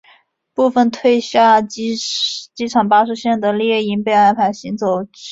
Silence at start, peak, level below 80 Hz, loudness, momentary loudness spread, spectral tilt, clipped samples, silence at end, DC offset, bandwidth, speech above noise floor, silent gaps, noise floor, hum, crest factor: 0.6 s; -2 dBFS; -60 dBFS; -16 LUFS; 9 LU; -4.5 dB/octave; under 0.1%; 0 s; under 0.1%; 8 kHz; 37 dB; none; -52 dBFS; none; 14 dB